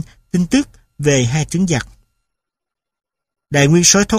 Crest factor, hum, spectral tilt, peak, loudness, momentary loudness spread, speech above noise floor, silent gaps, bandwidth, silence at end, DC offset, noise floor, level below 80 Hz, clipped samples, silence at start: 16 dB; none; -4 dB/octave; 0 dBFS; -15 LUFS; 12 LU; 70 dB; none; 15.5 kHz; 0 s; under 0.1%; -84 dBFS; -40 dBFS; under 0.1%; 0 s